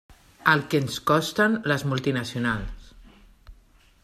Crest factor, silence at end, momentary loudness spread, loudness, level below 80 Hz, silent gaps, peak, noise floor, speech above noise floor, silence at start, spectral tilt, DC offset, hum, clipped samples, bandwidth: 22 dB; 0.5 s; 6 LU; -24 LUFS; -46 dBFS; none; -4 dBFS; -57 dBFS; 33 dB; 0.4 s; -5 dB/octave; under 0.1%; none; under 0.1%; 15 kHz